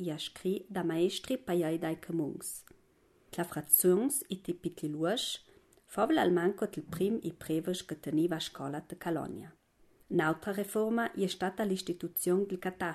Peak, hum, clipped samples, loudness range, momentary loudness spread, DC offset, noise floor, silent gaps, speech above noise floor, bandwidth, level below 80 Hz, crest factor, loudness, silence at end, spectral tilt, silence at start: -10 dBFS; none; under 0.1%; 4 LU; 12 LU; under 0.1%; -67 dBFS; none; 34 dB; 15 kHz; -68 dBFS; 22 dB; -33 LUFS; 0 s; -4.5 dB/octave; 0 s